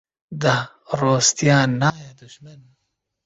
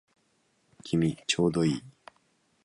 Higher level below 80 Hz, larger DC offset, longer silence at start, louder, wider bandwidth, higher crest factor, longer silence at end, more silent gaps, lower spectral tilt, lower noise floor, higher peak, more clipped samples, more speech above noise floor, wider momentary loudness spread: about the same, -56 dBFS vs -58 dBFS; neither; second, 0.3 s vs 0.85 s; first, -19 LUFS vs -28 LUFS; second, 8 kHz vs 11.5 kHz; about the same, 18 dB vs 20 dB; about the same, 0.75 s vs 0.75 s; neither; second, -4 dB/octave vs -5.5 dB/octave; first, -76 dBFS vs -71 dBFS; first, -2 dBFS vs -10 dBFS; neither; first, 56 dB vs 44 dB; first, 13 LU vs 10 LU